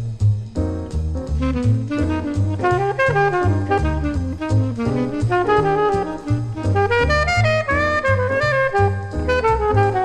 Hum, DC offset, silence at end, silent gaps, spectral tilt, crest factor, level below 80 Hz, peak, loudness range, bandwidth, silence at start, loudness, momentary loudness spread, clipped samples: none; under 0.1%; 0 s; none; -7 dB/octave; 14 dB; -30 dBFS; -6 dBFS; 2 LU; 9.8 kHz; 0 s; -19 LUFS; 7 LU; under 0.1%